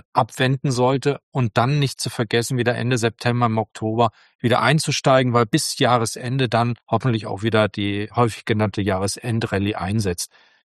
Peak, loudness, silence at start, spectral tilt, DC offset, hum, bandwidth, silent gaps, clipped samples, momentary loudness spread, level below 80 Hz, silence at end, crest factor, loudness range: -2 dBFS; -21 LUFS; 0.15 s; -5 dB/octave; under 0.1%; none; 12.5 kHz; 1.23-1.32 s, 4.35-4.39 s; under 0.1%; 7 LU; -54 dBFS; 0.4 s; 20 dB; 3 LU